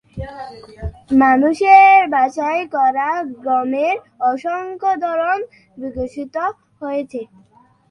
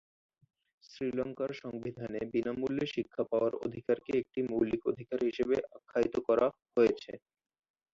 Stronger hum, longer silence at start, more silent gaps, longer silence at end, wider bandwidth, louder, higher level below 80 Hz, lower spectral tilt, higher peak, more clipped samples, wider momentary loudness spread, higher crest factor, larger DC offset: neither; second, 0.15 s vs 0.9 s; neither; about the same, 0.65 s vs 0.75 s; first, 9.6 kHz vs 7.4 kHz; first, -16 LUFS vs -33 LUFS; first, -44 dBFS vs -66 dBFS; about the same, -6 dB/octave vs -7 dB/octave; first, 0 dBFS vs -14 dBFS; neither; first, 21 LU vs 10 LU; about the same, 16 dB vs 18 dB; neither